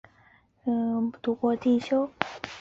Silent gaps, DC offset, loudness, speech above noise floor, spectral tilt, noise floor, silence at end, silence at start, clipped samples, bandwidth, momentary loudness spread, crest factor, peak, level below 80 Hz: none; under 0.1%; -28 LUFS; 34 dB; -6 dB/octave; -61 dBFS; 0 s; 0.65 s; under 0.1%; 7.6 kHz; 8 LU; 26 dB; -2 dBFS; -66 dBFS